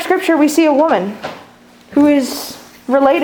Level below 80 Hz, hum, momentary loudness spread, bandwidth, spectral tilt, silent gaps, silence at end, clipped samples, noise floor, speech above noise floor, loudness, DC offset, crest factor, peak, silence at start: -56 dBFS; none; 17 LU; 20 kHz; -4.5 dB/octave; none; 0 s; under 0.1%; -43 dBFS; 30 dB; -13 LUFS; under 0.1%; 14 dB; 0 dBFS; 0 s